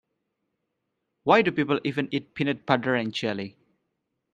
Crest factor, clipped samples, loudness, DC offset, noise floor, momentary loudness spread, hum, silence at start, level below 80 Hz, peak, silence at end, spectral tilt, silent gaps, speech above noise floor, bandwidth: 24 dB; under 0.1%; -25 LUFS; under 0.1%; -80 dBFS; 11 LU; none; 1.25 s; -66 dBFS; -4 dBFS; 0.85 s; -6.5 dB/octave; none; 55 dB; 9.2 kHz